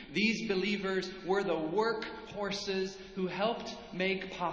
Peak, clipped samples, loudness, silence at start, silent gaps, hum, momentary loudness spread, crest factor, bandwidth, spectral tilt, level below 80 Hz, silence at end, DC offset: -18 dBFS; under 0.1%; -34 LUFS; 0 s; none; none; 9 LU; 16 dB; 8 kHz; -5 dB/octave; -62 dBFS; 0 s; under 0.1%